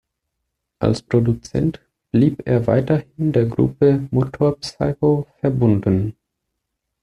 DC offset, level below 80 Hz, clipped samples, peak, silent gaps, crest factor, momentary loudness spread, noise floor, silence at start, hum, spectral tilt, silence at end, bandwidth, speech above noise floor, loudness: under 0.1%; -46 dBFS; under 0.1%; -2 dBFS; none; 16 dB; 6 LU; -78 dBFS; 0.8 s; none; -8.5 dB/octave; 0.9 s; 10.5 kHz; 60 dB; -19 LUFS